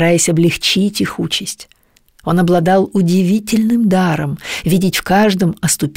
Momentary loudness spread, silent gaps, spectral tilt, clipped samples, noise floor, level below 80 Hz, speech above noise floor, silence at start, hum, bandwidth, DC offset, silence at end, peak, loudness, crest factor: 8 LU; none; -5 dB/octave; under 0.1%; -52 dBFS; -44 dBFS; 38 dB; 0 s; none; 16.5 kHz; 0.4%; 0.05 s; -2 dBFS; -14 LUFS; 12 dB